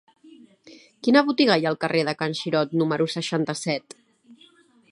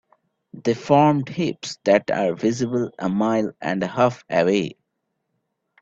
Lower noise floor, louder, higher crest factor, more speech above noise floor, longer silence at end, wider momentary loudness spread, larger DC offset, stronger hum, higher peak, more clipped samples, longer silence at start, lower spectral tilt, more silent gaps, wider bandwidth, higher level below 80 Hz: second, -56 dBFS vs -76 dBFS; about the same, -23 LUFS vs -21 LUFS; about the same, 20 dB vs 20 dB; second, 34 dB vs 56 dB; second, 0.55 s vs 1.1 s; about the same, 8 LU vs 9 LU; neither; neither; about the same, -4 dBFS vs -2 dBFS; neither; about the same, 0.65 s vs 0.55 s; about the same, -5 dB/octave vs -6 dB/octave; neither; first, 11.5 kHz vs 7.8 kHz; second, -72 dBFS vs -62 dBFS